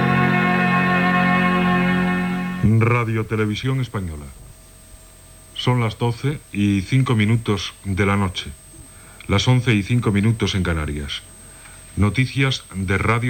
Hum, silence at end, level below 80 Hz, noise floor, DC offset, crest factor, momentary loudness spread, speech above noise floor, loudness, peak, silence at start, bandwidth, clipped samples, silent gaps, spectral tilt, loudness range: none; 0 s; -40 dBFS; -44 dBFS; under 0.1%; 16 dB; 14 LU; 25 dB; -20 LUFS; -4 dBFS; 0 s; 19 kHz; under 0.1%; none; -6 dB/octave; 6 LU